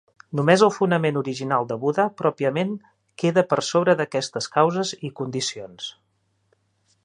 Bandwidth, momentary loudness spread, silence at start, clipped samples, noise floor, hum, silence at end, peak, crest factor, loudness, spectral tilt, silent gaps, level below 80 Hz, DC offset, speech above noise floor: 11 kHz; 13 LU; 0.3 s; under 0.1%; -69 dBFS; none; 1.15 s; 0 dBFS; 22 dB; -22 LUFS; -5 dB/octave; none; -70 dBFS; under 0.1%; 47 dB